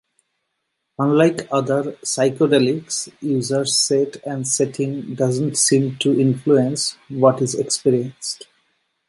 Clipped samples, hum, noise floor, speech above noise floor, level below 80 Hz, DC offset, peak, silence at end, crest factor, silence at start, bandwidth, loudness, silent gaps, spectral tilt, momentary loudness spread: under 0.1%; none; -75 dBFS; 56 dB; -64 dBFS; under 0.1%; -2 dBFS; 0.75 s; 18 dB; 1 s; 11.5 kHz; -19 LUFS; none; -4.5 dB/octave; 9 LU